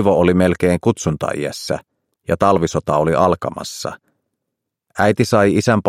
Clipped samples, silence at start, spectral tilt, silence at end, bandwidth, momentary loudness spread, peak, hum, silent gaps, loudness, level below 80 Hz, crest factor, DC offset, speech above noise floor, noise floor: under 0.1%; 0 s; -6 dB/octave; 0 s; 15.5 kHz; 12 LU; 0 dBFS; none; none; -17 LUFS; -46 dBFS; 16 dB; under 0.1%; 63 dB; -79 dBFS